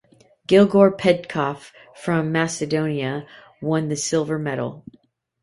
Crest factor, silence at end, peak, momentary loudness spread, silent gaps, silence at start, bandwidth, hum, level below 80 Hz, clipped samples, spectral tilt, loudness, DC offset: 20 dB; 0.6 s; -2 dBFS; 16 LU; none; 0.5 s; 11.5 kHz; none; -60 dBFS; under 0.1%; -5.5 dB/octave; -21 LUFS; under 0.1%